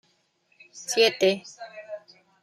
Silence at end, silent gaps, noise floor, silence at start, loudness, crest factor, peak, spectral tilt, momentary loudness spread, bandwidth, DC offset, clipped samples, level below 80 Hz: 0.45 s; none; -68 dBFS; 0.75 s; -23 LUFS; 20 dB; -8 dBFS; -2.5 dB/octave; 22 LU; 15 kHz; under 0.1%; under 0.1%; -82 dBFS